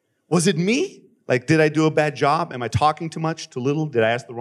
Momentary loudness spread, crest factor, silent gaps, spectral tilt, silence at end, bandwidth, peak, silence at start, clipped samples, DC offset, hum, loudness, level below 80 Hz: 8 LU; 16 dB; none; -5.5 dB/octave; 0 s; 13 kHz; -4 dBFS; 0.3 s; under 0.1%; under 0.1%; none; -21 LUFS; -54 dBFS